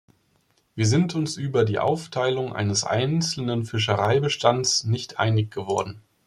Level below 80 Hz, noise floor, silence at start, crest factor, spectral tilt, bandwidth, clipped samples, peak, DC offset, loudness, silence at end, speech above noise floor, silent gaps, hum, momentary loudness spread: -60 dBFS; -66 dBFS; 0.75 s; 20 dB; -4.5 dB/octave; 12 kHz; under 0.1%; -4 dBFS; under 0.1%; -23 LUFS; 0.3 s; 43 dB; none; none; 6 LU